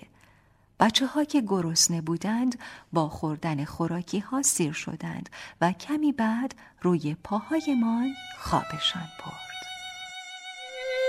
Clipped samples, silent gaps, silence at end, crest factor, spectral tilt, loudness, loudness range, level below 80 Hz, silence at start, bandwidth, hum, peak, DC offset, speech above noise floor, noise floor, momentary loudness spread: under 0.1%; none; 0 s; 22 dB; -4 dB/octave; -27 LUFS; 4 LU; -58 dBFS; 0.8 s; 16 kHz; none; -6 dBFS; under 0.1%; 33 dB; -61 dBFS; 15 LU